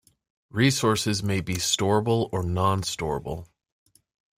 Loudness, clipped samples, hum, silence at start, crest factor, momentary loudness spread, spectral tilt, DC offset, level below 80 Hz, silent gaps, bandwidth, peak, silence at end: -25 LUFS; under 0.1%; none; 0.55 s; 18 dB; 10 LU; -4.5 dB/octave; under 0.1%; -52 dBFS; none; 16 kHz; -8 dBFS; 0.95 s